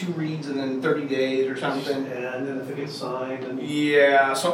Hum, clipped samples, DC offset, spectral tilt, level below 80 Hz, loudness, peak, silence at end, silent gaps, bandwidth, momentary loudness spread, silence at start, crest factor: none; under 0.1%; under 0.1%; -5 dB/octave; -78 dBFS; -24 LUFS; -6 dBFS; 0 s; none; 17 kHz; 12 LU; 0 s; 18 dB